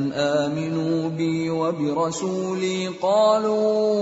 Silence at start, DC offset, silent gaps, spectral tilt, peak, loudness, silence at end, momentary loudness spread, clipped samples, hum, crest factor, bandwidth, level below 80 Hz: 0 s; under 0.1%; none; -5.5 dB/octave; -8 dBFS; -22 LUFS; 0 s; 6 LU; under 0.1%; none; 14 dB; 8 kHz; -64 dBFS